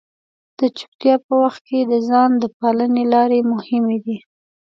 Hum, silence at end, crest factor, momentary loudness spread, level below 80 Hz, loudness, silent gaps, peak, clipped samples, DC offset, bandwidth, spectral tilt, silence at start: none; 0.5 s; 16 dB; 7 LU; -72 dBFS; -17 LUFS; 0.88-0.99 s, 1.24-1.29 s, 1.61-1.65 s, 2.53-2.60 s; -2 dBFS; under 0.1%; under 0.1%; 6.4 kHz; -7 dB/octave; 0.6 s